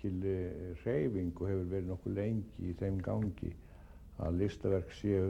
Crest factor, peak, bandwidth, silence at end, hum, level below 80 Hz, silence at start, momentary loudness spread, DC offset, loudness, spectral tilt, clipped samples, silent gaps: 16 dB; -20 dBFS; 8.2 kHz; 0 s; none; -54 dBFS; 0 s; 10 LU; under 0.1%; -37 LUFS; -9 dB/octave; under 0.1%; none